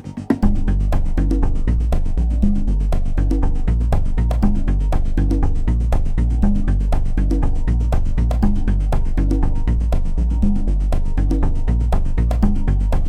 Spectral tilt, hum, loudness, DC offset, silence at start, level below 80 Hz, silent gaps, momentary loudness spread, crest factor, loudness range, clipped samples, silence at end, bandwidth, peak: -8.5 dB/octave; none; -20 LUFS; under 0.1%; 0.05 s; -16 dBFS; none; 3 LU; 12 dB; 1 LU; under 0.1%; 0 s; 7.8 kHz; -2 dBFS